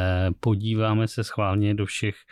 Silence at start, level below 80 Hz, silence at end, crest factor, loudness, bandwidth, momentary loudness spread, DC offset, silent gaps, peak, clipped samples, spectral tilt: 0 s; -48 dBFS; 0.2 s; 10 dB; -25 LUFS; 12 kHz; 4 LU; under 0.1%; none; -14 dBFS; under 0.1%; -6.5 dB/octave